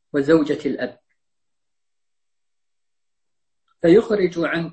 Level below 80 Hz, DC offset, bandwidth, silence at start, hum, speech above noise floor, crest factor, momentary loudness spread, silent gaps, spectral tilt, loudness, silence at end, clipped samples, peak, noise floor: -58 dBFS; under 0.1%; 8.6 kHz; 0.15 s; none; 68 dB; 20 dB; 11 LU; none; -7 dB/octave; -19 LUFS; 0 s; under 0.1%; -4 dBFS; -86 dBFS